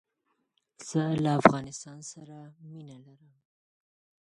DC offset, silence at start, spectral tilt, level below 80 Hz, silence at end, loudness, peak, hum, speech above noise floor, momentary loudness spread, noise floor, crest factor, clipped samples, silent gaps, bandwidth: under 0.1%; 0.8 s; -6 dB/octave; -68 dBFS; 1.3 s; -26 LUFS; 0 dBFS; none; 49 dB; 26 LU; -78 dBFS; 30 dB; under 0.1%; none; 11.5 kHz